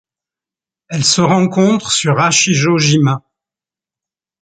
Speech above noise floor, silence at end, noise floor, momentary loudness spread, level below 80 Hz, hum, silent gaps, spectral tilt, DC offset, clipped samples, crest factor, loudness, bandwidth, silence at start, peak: 77 dB; 1.25 s; -89 dBFS; 5 LU; -54 dBFS; none; none; -4 dB/octave; under 0.1%; under 0.1%; 16 dB; -12 LUFS; 9.4 kHz; 0.9 s; 0 dBFS